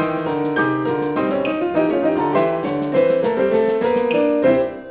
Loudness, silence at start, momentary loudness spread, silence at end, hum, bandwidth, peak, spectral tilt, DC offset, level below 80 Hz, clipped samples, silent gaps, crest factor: -18 LUFS; 0 s; 4 LU; 0 s; none; 4 kHz; -4 dBFS; -10.5 dB/octave; under 0.1%; -54 dBFS; under 0.1%; none; 14 dB